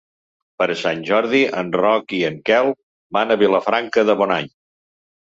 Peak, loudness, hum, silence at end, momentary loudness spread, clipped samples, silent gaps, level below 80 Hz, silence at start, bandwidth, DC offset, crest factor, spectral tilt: -4 dBFS; -18 LUFS; none; 0.75 s; 7 LU; under 0.1%; 2.83-3.10 s; -62 dBFS; 0.6 s; 7.8 kHz; under 0.1%; 16 dB; -5.5 dB/octave